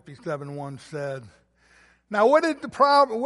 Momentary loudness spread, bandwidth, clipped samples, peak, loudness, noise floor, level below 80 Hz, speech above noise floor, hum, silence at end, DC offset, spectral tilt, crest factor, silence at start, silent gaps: 17 LU; 11.5 kHz; under 0.1%; -6 dBFS; -23 LUFS; -58 dBFS; -66 dBFS; 36 dB; none; 0 s; under 0.1%; -5.5 dB/octave; 18 dB; 0.05 s; none